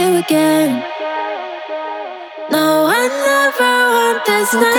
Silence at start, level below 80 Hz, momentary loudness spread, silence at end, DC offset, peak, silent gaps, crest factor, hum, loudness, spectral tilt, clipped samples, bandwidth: 0 s; -70 dBFS; 12 LU; 0 s; under 0.1%; -2 dBFS; none; 14 dB; none; -14 LUFS; -3 dB/octave; under 0.1%; over 20 kHz